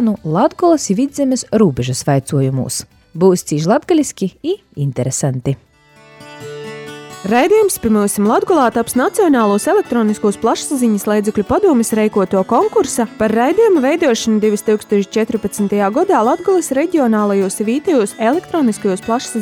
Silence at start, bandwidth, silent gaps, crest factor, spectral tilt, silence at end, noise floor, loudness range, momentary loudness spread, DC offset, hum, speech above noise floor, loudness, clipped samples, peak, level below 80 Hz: 0 s; 17.5 kHz; none; 14 dB; -5.5 dB/octave; 0 s; -45 dBFS; 4 LU; 8 LU; under 0.1%; none; 31 dB; -15 LUFS; under 0.1%; 0 dBFS; -48 dBFS